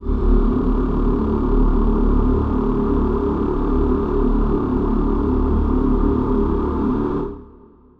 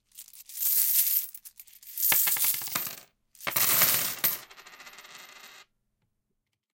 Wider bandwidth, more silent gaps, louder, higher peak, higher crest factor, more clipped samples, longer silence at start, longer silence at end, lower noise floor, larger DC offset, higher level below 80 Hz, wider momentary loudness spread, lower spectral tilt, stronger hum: second, 4.1 kHz vs 17.5 kHz; neither; first, -20 LUFS vs -24 LUFS; about the same, -4 dBFS vs -6 dBFS; second, 14 dB vs 24 dB; neither; second, 0 s vs 0.15 s; second, 0.5 s vs 1.15 s; second, -46 dBFS vs -81 dBFS; neither; first, -20 dBFS vs -72 dBFS; second, 2 LU vs 24 LU; first, -11 dB/octave vs 0.5 dB/octave; neither